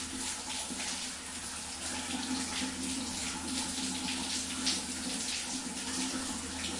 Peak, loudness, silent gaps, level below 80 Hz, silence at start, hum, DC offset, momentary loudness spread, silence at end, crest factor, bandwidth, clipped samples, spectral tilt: -18 dBFS; -34 LUFS; none; -60 dBFS; 0 s; none; under 0.1%; 5 LU; 0 s; 20 dB; 11.5 kHz; under 0.1%; -1.5 dB/octave